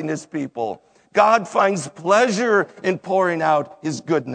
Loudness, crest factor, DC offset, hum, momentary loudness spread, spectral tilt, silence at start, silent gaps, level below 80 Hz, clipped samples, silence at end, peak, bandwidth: -20 LUFS; 18 dB; under 0.1%; none; 12 LU; -5 dB/octave; 0 s; none; -72 dBFS; under 0.1%; 0 s; 0 dBFS; 9.4 kHz